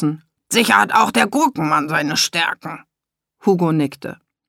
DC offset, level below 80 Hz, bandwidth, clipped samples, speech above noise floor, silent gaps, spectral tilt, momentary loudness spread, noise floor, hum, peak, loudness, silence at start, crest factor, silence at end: under 0.1%; -64 dBFS; 18 kHz; under 0.1%; 67 dB; none; -3.5 dB/octave; 19 LU; -84 dBFS; none; 0 dBFS; -17 LUFS; 0 s; 18 dB; 0.35 s